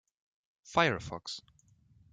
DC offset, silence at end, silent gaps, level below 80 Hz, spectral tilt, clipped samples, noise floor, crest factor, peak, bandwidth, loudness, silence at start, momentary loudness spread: under 0.1%; 0.75 s; none; -64 dBFS; -4.5 dB/octave; under 0.1%; -65 dBFS; 24 dB; -12 dBFS; 9.4 kHz; -32 LUFS; 0.65 s; 14 LU